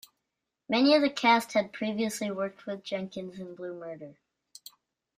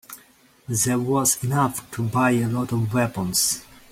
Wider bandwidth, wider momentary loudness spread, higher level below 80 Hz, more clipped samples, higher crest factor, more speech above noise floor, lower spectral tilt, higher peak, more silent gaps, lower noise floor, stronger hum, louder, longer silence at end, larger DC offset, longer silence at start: about the same, 15.5 kHz vs 16.5 kHz; first, 23 LU vs 8 LU; second, -76 dBFS vs -54 dBFS; neither; about the same, 20 dB vs 18 dB; first, 56 dB vs 32 dB; about the same, -4 dB/octave vs -4 dB/octave; second, -10 dBFS vs -4 dBFS; neither; first, -85 dBFS vs -54 dBFS; neither; second, -28 LUFS vs -22 LUFS; first, 1.05 s vs 0.15 s; neither; first, 0.7 s vs 0.1 s